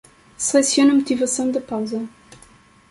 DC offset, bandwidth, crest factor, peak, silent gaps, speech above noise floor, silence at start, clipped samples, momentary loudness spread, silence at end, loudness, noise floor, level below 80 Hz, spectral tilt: under 0.1%; 11.5 kHz; 18 dB; -4 dBFS; none; 32 dB; 0.4 s; under 0.1%; 13 LU; 0.8 s; -19 LUFS; -50 dBFS; -60 dBFS; -2.5 dB/octave